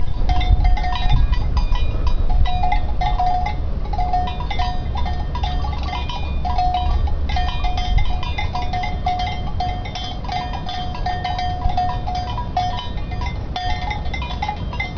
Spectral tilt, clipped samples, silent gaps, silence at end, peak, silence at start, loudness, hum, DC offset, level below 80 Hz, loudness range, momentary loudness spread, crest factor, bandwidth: -6 dB/octave; under 0.1%; none; 0 s; -2 dBFS; 0 s; -23 LUFS; none; under 0.1%; -20 dBFS; 3 LU; 5 LU; 16 dB; 5.4 kHz